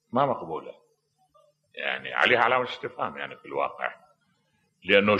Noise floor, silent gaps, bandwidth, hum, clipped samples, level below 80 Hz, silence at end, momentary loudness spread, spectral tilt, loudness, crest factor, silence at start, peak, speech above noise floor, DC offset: -71 dBFS; none; 8.4 kHz; none; under 0.1%; -70 dBFS; 0 s; 16 LU; -5.5 dB/octave; -26 LUFS; 22 dB; 0.15 s; -6 dBFS; 45 dB; under 0.1%